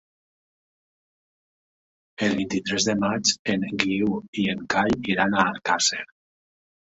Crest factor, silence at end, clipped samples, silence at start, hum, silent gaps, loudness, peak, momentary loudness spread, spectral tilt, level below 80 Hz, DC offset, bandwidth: 24 dB; 0.8 s; under 0.1%; 2.2 s; none; 3.39-3.45 s, 4.28-4.33 s; -23 LUFS; -2 dBFS; 5 LU; -3 dB/octave; -56 dBFS; under 0.1%; 8 kHz